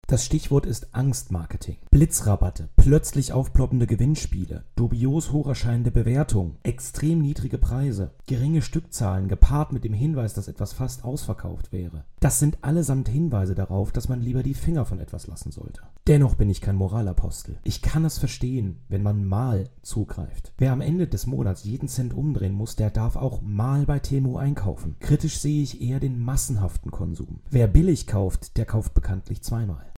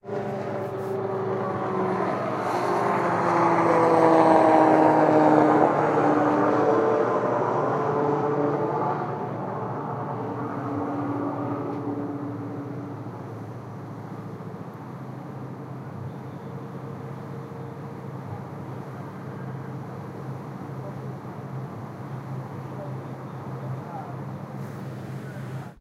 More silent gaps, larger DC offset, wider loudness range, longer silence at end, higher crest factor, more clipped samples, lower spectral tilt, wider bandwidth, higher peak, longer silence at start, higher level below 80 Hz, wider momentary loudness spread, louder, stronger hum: neither; neither; second, 4 LU vs 18 LU; about the same, 0.05 s vs 0.05 s; about the same, 22 dB vs 22 dB; neither; second, -6.5 dB/octave vs -8 dB/octave; first, 16.5 kHz vs 13 kHz; about the same, -2 dBFS vs -4 dBFS; about the same, 0.05 s vs 0.05 s; first, -28 dBFS vs -66 dBFS; second, 11 LU vs 19 LU; about the same, -25 LUFS vs -24 LUFS; neither